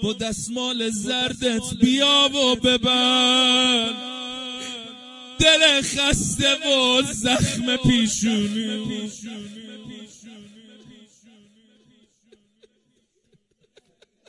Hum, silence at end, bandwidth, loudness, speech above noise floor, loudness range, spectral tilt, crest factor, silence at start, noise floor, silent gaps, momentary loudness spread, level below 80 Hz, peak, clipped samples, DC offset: none; 3.8 s; 11.5 kHz; -19 LUFS; 47 dB; 11 LU; -3 dB/octave; 20 dB; 0 s; -67 dBFS; none; 21 LU; -44 dBFS; -4 dBFS; under 0.1%; under 0.1%